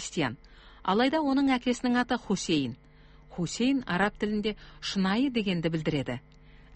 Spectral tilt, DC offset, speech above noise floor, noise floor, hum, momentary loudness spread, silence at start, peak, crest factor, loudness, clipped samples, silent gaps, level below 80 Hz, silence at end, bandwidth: -5 dB/octave; under 0.1%; 24 dB; -52 dBFS; none; 11 LU; 0 s; -12 dBFS; 16 dB; -29 LUFS; under 0.1%; none; -54 dBFS; 0 s; 8.8 kHz